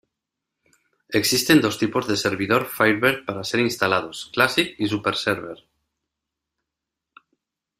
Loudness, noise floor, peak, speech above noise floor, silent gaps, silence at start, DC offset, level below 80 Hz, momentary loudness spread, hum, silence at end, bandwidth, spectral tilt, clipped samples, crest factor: -21 LUFS; -84 dBFS; -2 dBFS; 63 dB; none; 1.1 s; under 0.1%; -60 dBFS; 8 LU; none; 2.25 s; 16 kHz; -3.5 dB/octave; under 0.1%; 22 dB